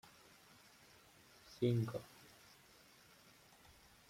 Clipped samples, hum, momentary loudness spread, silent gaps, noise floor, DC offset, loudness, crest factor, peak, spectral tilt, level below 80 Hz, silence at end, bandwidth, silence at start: under 0.1%; none; 26 LU; none; -66 dBFS; under 0.1%; -40 LUFS; 22 dB; -24 dBFS; -7 dB/octave; -76 dBFS; 2.05 s; 16 kHz; 1.5 s